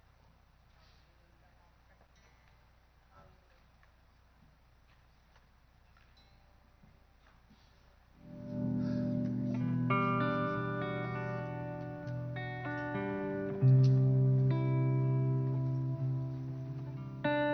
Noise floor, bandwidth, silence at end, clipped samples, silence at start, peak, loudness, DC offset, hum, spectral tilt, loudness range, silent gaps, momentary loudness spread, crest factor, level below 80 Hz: -65 dBFS; 5.6 kHz; 0 s; under 0.1%; 3.15 s; -18 dBFS; -33 LUFS; under 0.1%; none; -9.5 dB/octave; 10 LU; none; 14 LU; 18 dB; -64 dBFS